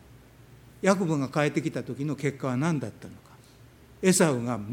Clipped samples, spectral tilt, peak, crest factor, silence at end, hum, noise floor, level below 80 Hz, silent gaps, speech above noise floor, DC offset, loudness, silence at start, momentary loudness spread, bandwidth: under 0.1%; -5.5 dB/octave; -6 dBFS; 22 dB; 0 s; none; -53 dBFS; -62 dBFS; none; 27 dB; under 0.1%; -27 LUFS; 0.5 s; 10 LU; 18 kHz